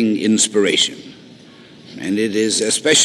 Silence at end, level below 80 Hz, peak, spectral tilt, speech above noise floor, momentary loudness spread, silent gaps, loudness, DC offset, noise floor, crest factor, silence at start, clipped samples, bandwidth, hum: 0 s; -66 dBFS; -2 dBFS; -2 dB/octave; 26 dB; 15 LU; none; -16 LUFS; under 0.1%; -42 dBFS; 16 dB; 0 s; under 0.1%; 14 kHz; none